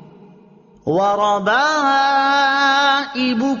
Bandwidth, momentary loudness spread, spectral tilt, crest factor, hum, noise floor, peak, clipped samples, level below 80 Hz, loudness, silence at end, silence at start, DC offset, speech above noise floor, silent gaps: 7.2 kHz; 5 LU; -1 dB/octave; 12 dB; none; -47 dBFS; -6 dBFS; under 0.1%; -62 dBFS; -16 LUFS; 0 s; 0.85 s; under 0.1%; 32 dB; none